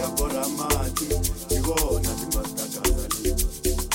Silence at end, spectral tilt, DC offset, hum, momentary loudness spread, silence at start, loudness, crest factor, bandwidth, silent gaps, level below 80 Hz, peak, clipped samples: 0 s; -4 dB/octave; under 0.1%; none; 3 LU; 0 s; -25 LUFS; 18 dB; 17 kHz; none; -28 dBFS; -6 dBFS; under 0.1%